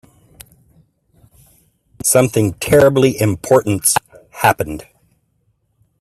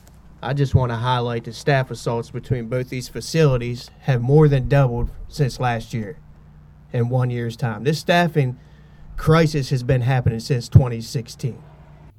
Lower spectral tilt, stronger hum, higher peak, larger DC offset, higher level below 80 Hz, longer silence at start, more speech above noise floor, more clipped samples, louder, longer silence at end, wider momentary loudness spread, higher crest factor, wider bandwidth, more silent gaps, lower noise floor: second, -4.5 dB/octave vs -7 dB/octave; neither; about the same, 0 dBFS vs 0 dBFS; neither; second, -46 dBFS vs -38 dBFS; first, 2.05 s vs 0.4 s; first, 50 dB vs 26 dB; neither; first, -14 LUFS vs -21 LUFS; first, 1.2 s vs 0.1 s; second, 8 LU vs 13 LU; about the same, 18 dB vs 20 dB; first, 16 kHz vs 14 kHz; neither; first, -63 dBFS vs -45 dBFS